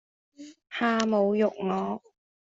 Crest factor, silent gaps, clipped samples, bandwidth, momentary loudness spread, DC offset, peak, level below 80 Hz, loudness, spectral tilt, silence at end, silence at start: 18 dB; none; under 0.1%; 7.8 kHz; 12 LU; under 0.1%; -10 dBFS; -72 dBFS; -27 LUFS; -5.5 dB/octave; 0.5 s; 0.4 s